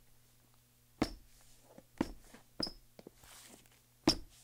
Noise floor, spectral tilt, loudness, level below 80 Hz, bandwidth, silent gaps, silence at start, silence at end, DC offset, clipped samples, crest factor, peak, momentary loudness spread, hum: -67 dBFS; -4 dB/octave; -38 LUFS; -58 dBFS; 17.5 kHz; none; 1 s; 0.2 s; under 0.1%; under 0.1%; 26 dB; -16 dBFS; 26 LU; none